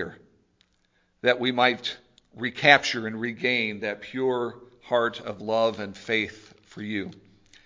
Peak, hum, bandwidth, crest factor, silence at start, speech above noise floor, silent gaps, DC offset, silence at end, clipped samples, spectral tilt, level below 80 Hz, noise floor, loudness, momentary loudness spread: 0 dBFS; none; 7.6 kHz; 26 dB; 0 s; 43 dB; none; under 0.1%; 0.5 s; under 0.1%; -4 dB/octave; -64 dBFS; -68 dBFS; -25 LUFS; 15 LU